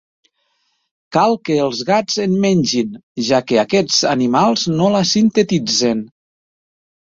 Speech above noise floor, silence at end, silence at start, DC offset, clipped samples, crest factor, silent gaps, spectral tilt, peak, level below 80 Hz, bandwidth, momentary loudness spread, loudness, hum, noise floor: 51 dB; 0.95 s; 1.1 s; under 0.1%; under 0.1%; 16 dB; 3.03-3.15 s; -4.5 dB/octave; -2 dBFS; -56 dBFS; 7.8 kHz; 6 LU; -16 LUFS; none; -66 dBFS